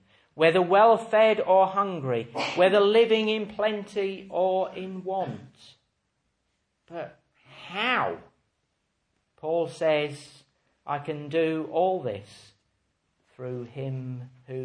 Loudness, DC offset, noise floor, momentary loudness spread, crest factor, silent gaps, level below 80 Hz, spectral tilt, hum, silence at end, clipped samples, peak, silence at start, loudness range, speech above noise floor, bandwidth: -25 LUFS; under 0.1%; -76 dBFS; 19 LU; 20 dB; none; -72 dBFS; -6 dB/octave; none; 0 s; under 0.1%; -6 dBFS; 0.35 s; 11 LU; 51 dB; 10 kHz